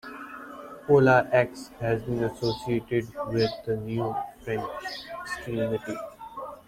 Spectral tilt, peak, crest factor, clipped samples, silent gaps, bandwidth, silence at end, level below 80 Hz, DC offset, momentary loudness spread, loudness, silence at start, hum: -6.5 dB/octave; -6 dBFS; 20 dB; under 0.1%; none; 16 kHz; 0.05 s; -54 dBFS; under 0.1%; 19 LU; -27 LUFS; 0.05 s; none